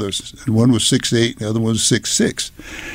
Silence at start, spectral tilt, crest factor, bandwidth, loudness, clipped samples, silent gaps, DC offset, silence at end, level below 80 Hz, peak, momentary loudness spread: 0 s; -4 dB/octave; 14 dB; 16 kHz; -17 LUFS; under 0.1%; none; under 0.1%; 0 s; -44 dBFS; -4 dBFS; 11 LU